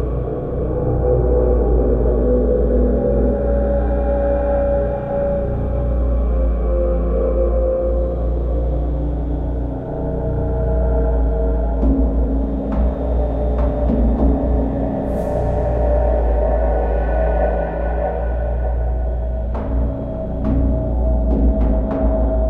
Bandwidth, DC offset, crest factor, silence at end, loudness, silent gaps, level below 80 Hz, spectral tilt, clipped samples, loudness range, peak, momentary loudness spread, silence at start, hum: 2.7 kHz; under 0.1%; 12 dB; 0 s; -19 LUFS; none; -18 dBFS; -11.5 dB/octave; under 0.1%; 4 LU; -4 dBFS; 6 LU; 0 s; none